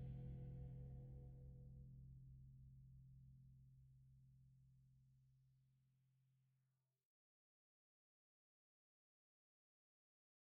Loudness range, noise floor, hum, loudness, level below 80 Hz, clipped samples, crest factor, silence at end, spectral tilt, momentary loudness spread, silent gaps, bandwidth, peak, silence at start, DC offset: 9 LU; -89 dBFS; none; -60 LUFS; -68 dBFS; under 0.1%; 18 dB; 4.05 s; -12 dB/octave; 12 LU; none; 3.3 kHz; -44 dBFS; 0 s; under 0.1%